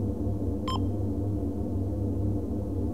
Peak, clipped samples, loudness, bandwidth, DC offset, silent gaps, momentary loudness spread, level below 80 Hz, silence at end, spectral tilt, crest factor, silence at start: -16 dBFS; under 0.1%; -31 LUFS; 10 kHz; 0.9%; none; 2 LU; -38 dBFS; 0 s; -8.5 dB/octave; 12 dB; 0 s